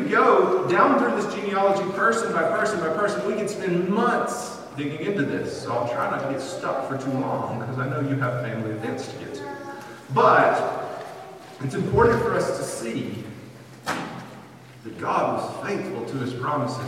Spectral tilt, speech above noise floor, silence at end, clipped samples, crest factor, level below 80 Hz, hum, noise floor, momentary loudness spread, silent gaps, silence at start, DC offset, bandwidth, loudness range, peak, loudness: -6 dB/octave; 21 dB; 0 s; under 0.1%; 20 dB; -54 dBFS; none; -44 dBFS; 17 LU; none; 0 s; under 0.1%; 16 kHz; 7 LU; -4 dBFS; -24 LUFS